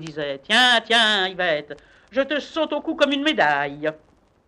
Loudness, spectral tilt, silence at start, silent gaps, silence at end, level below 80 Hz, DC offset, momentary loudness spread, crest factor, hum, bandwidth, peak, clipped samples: -20 LUFS; -2.5 dB/octave; 0 s; none; 0.5 s; -62 dBFS; under 0.1%; 14 LU; 18 dB; none; 12.5 kHz; -4 dBFS; under 0.1%